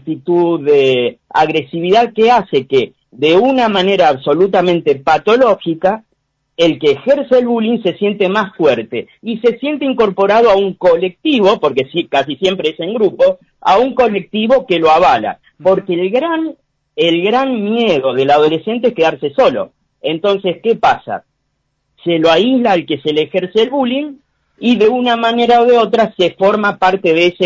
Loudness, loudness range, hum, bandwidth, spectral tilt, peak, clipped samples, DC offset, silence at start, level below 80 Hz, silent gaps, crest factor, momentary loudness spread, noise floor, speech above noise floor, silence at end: -13 LUFS; 3 LU; none; 7.6 kHz; -6 dB/octave; -2 dBFS; under 0.1%; under 0.1%; 0.05 s; -52 dBFS; none; 12 dB; 7 LU; -67 dBFS; 55 dB; 0 s